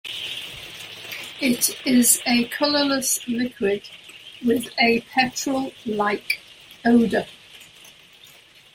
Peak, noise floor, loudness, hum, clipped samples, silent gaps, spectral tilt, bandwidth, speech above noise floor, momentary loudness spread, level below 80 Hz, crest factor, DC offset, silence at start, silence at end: -2 dBFS; -50 dBFS; -21 LUFS; none; under 0.1%; none; -2.5 dB/octave; 16.5 kHz; 29 dB; 16 LU; -60 dBFS; 20 dB; under 0.1%; 0.05 s; 0.5 s